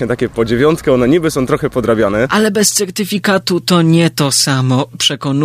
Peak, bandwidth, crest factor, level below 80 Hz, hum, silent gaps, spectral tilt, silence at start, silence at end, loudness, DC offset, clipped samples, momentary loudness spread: 0 dBFS; 15.5 kHz; 12 dB; -40 dBFS; none; none; -4.5 dB/octave; 0 s; 0 s; -13 LUFS; under 0.1%; under 0.1%; 4 LU